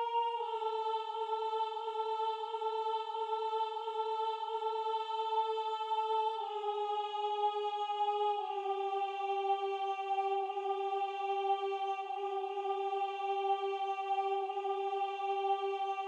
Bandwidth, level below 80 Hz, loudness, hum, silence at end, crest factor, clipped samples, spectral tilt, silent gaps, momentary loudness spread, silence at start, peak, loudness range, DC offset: 8.8 kHz; under -90 dBFS; -36 LUFS; none; 0 s; 14 dB; under 0.1%; -1 dB/octave; none; 3 LU; 0 s; -22 dBFS; 1 LU; under 0.1%